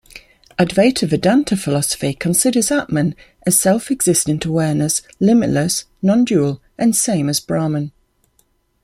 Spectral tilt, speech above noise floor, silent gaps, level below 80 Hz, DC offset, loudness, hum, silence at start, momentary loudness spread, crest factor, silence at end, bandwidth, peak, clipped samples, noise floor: -4.5 dB/octave; 45 dB; none; -48 dBFS; under 0.1%; -16 LUFS; none; 0.15 s; 6 LU; 16 dB; 0.95 s; 16 kHz; 0 dBFS; under 0.1%; -61 dBFS